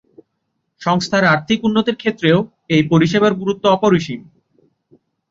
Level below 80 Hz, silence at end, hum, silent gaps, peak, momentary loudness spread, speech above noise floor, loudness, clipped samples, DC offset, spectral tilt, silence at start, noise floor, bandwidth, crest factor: -54 dBFS; 1.1 s; none; none; -2 dBFS; 6 LU; 56 dB; -16 LUFS; under 0.1%; under 0.1%; -6 dB/octave; 0.8 s; -72 dBFS; 7.8 kHz; 16 dB